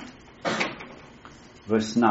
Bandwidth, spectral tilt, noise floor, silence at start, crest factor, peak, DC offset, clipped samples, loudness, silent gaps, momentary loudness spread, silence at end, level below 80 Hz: 8 kHz; -3.5 dB/octave; -48 dBFS; 0 s; 22 dB; -6 dBFS; under 0.1%; under 0.1%; -27 LUFS; none; 22 LU; 0 s; -60 dBFS